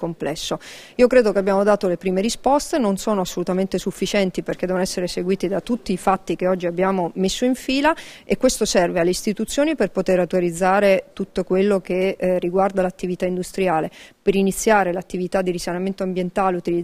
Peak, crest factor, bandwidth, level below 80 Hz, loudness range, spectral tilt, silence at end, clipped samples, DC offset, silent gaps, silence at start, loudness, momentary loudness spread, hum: -2 dBFS; 18 dB; 16 kHz; -46 dBFS; 3 LU; -5 dB/octave; 0 s; under 0.1%; under 0.1%; none; 0 s; -20 LUFS; 7 LU; none